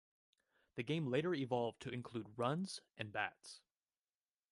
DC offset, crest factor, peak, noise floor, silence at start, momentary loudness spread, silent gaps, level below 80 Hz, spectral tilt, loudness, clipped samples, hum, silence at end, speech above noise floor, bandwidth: under 0.1%; 20 dB; -24 dBFS; under -90 dBFS; 0.75 s; 14 LU; none; -80 dBFS; -6 dB/octave; -42 LUFS; under 0.1%; none; 0.95 s; over 48 dB; 11.5 kHz